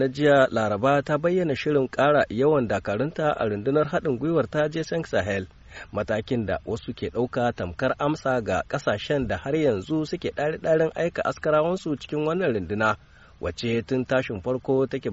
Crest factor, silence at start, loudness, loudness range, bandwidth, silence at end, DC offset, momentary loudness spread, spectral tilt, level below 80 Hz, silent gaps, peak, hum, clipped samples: 18 dB; 0 s; -25 LUFS; 4 LU; 8 kHz; 0 s; under 0.1%; 8 LU; -5 dB/octave; -50 dBFS; none; -6 dBFS; none; under 0.1%